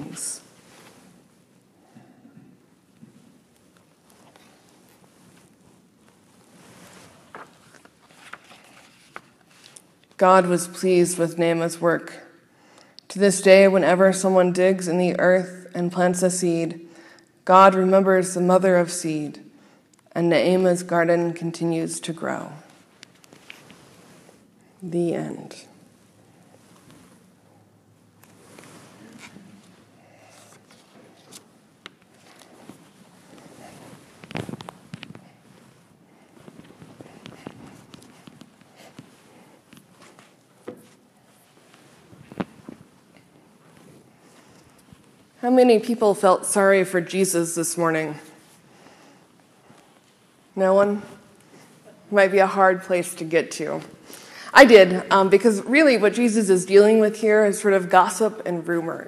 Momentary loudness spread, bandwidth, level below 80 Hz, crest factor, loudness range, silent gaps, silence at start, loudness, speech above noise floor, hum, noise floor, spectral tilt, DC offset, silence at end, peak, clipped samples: 23 LU; 14.5 kHz; -70 dBFS; 22 dB; 24 LU; none; 0 s; -19 LUFS; 39 dB; none; -57 dBFS; -5 dB/octave; under 0.1%; 0.05 s; 0 dBFS; under 0.1%